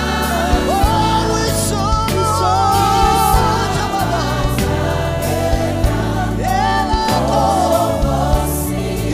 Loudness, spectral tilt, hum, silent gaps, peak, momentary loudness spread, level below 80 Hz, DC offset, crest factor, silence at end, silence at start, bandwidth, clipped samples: -16 LUFS; -5 dB/octave; none; none; -4 dBFS; 5 LU; -24 dBFS; under 0.1%; 12 dB; 0 s; 0 s; 15.5 kHz; under 0.1%